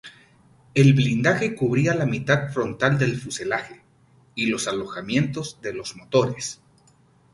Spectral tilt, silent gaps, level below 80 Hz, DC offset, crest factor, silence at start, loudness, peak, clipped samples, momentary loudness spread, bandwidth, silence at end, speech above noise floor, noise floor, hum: -5.5 dB/octave; none; -56 dBFS; under 0.1%; 20 dB; 0.05 s; -23 LUFS; -4 dBFS; under 0.1%; 13 LU; 11.5 kHz; 0.8 s; 35 dB; -58 dBFS; none